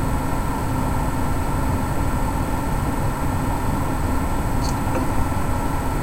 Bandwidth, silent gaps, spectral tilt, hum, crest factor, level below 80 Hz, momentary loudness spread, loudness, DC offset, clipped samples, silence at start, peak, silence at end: 16 kHz; none; -6.5 dB/octave; none; 14 dB; -26 dBFS; 1 LU; -24 LUFS; under 0.1%; under 0.1%; 0 s; -6 dBFS; 0 s